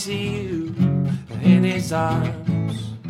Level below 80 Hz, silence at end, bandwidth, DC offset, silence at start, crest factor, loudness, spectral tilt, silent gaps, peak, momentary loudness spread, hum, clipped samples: -48 dBFS; 0 s; 13 kHz; under 0.1%; 0 s; 16 dB; -21 LUFS; -7 dB/octave; none; -4 dBFS; 9 LU; none; under 0.1%